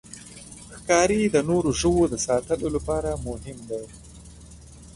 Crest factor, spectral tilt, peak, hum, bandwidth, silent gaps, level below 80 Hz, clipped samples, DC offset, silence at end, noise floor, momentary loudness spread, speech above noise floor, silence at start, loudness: 18 dB; -4.5 dB/octave; -6 dBFS; none; 11.5 kHz; none; -42 dBFS; under 0.1%; under 0.1%; 0.05 s; -45 dBFS; 21 LU; 22 dB; 0.1 s; -24 LUFS